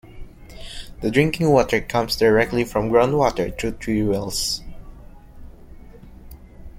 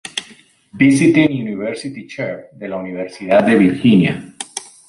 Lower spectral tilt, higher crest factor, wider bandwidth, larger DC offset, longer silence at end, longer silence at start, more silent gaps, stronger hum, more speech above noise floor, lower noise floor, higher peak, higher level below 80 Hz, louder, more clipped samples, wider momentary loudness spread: about the same, -5 dB/octave vs -6 dB/octave; first, 20 dB vs 14 dB; first, 16.5 kHz vs 11.5 kHz; neither; second, 0.05 s vs 0.25 s; about the same, 0.05 s vs 0.05 s; neither; neither; second, 22 dB vs 31 dB; second, -41 dBFS vs -46 dBFS; about the same, -2 dBFS vs -2 dBFS; first, -40 dBFS vs -54 dBFS; second, -20 LUFS vs -15 LUFS; neither; second, 12 LU vs 16 LU